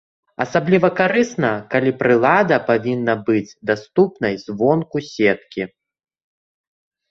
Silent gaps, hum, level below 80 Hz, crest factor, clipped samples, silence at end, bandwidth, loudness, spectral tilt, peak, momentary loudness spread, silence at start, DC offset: none; none; -58 dBFS; 18 dB; under 0.1%; 1.45 s; 7.6 kHz; -18 LUFS; -6.5 dB/octave; -2 dBFS; 10 LU; 0.4 s; under 0.1%